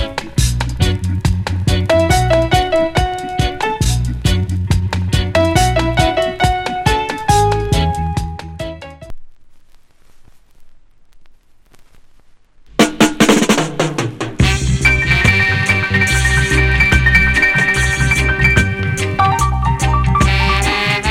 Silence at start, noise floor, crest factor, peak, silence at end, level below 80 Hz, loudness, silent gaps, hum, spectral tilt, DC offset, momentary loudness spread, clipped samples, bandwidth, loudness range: 0 s; -44 dBFS; 14 dB; 0 dBFS; 0 s; -22 dBFS; -14 LUFS; none; none; -4.5 dB/octave; under 0.1%; 7 LU; under 0.1%; 16.5 kHz; 8 LU